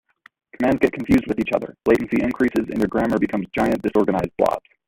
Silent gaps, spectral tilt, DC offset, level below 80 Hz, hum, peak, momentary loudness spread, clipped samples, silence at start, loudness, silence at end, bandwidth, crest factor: none; -7.5 dB/octave; under 0.1%; -46 dBFS; none; -2 dBFS; 4 LU; under 0.1%; 0.6 s; -21 LUFS; 0.3 s; 16.5 kHz; 20 dB